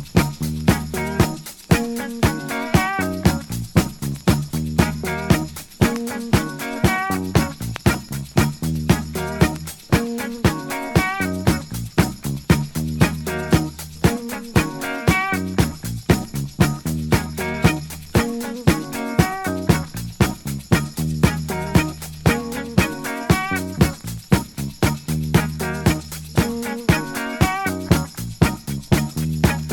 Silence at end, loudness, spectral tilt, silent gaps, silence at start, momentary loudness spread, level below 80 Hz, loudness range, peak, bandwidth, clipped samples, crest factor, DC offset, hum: 0 s; -21 LUFS; -5.5 dB/octave; none; 0 s; 6 LU; -32 dBFS; 1 LU; 0 dBFS; 19.5 kHz; under 0.1%; 20 dB; under 0.1%; none